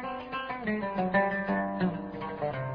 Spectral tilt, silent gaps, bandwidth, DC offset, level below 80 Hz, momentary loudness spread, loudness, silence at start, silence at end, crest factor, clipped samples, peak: -9.5 dB/octave; none; 5.2 kHz; under 0.1%; -58 dBFS; 9 LU; -31 LUFS; 0 s; 0 s; 18 dB; under 0.1%; -14 dBFS